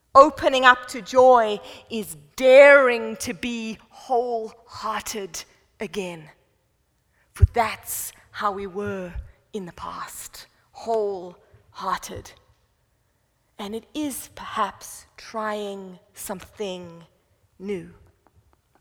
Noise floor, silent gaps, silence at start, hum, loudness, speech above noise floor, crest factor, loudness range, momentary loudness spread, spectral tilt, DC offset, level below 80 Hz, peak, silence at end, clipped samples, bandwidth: -68 dBFS; none; 0.15 s; none; -21 LUFS; 46 dB; 24 dB; 16 LU; 22 LU; -4.5 dB/octave; under 0.1%; -40 dBFS; 0 dBFS; 0.9 s; under 0.1%; 19 kHz